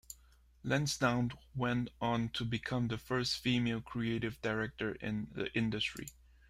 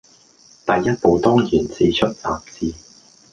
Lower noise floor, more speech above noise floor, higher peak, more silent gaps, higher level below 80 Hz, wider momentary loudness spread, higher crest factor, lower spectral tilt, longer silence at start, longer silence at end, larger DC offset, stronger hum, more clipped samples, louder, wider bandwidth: first, -64 dBFS vs -51 dBFS; second, 28 dB vs 33 dB; second, -18 dBFS vs -2 dBFS; neither; second, -58 dBFS vs -44 dBFS; second, 7 LU vs 12 LU; about the same, 20 dB vs 18 dB; about the same, -5 dB/octave vs -6 dB/octave; second, 0.1 s vs 0.65 s; second, 0.4 s vs 0.55 s; neither; neither; neither; second, -36 LUFS vs -19 LUFS; first, 16 kHz vs 9.2 kHz